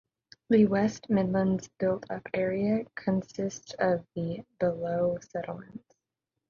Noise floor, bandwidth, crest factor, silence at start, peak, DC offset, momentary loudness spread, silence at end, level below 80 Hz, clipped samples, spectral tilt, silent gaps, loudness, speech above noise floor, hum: -87 dBFS; 7.2 kHz; 18 dB; 0.5 s; -12 dBFS; under 0.1%; 12 LU; 0.7 s; -62 dBFS; under 0.1%; -7 dB/octave; none; -29 LUFS; 58 dB; none